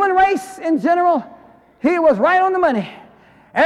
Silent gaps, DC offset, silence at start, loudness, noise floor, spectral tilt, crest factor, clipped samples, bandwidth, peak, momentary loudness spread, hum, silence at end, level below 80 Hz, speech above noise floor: none; under 0.1%; 0 s; -17 LUFS; -48 dBFS; -5.5 dB/octave; 12 dB; under 0.1%; 13 kHz; -4 dBFS; 9 LU; none; 0 s; -54 dBFS; 32 dB